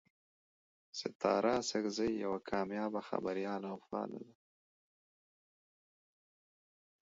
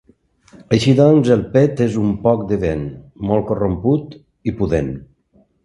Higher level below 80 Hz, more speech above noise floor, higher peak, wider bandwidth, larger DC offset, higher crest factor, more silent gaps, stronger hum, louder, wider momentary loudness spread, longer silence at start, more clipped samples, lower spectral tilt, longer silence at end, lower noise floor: second, -74 dBFS vs -38 dBFS; first, over 53 dB vs 41 dB; second, -18 dBFS vs 0 dBFS; second, 7.6 kHz vs 11.5 kHz; neither; first, 22 dB vs 16 dB; first, 1.15-1.20 s vs none; neither; second, -38 LUFS vs -17 LUFS; second, 11 LU vs 15 LU; first, 0.95 s vs 0.7 s; neither; second, -4 dB/octave vs -7.5 dB/octave; first, 2.75 s vs 0.6 s; first, under -90 dBFS vs -57 dBFS